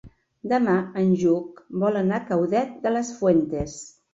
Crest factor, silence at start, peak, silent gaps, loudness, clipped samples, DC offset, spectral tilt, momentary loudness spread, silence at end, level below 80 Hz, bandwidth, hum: 16 dB; 0.05 s; -6 dBFS; none; -23 LUFS; under 0.1%; under 0.1%; -7 dB/octave; 11 LU; 0.25 s; -52 dBFS; 8 kHz; none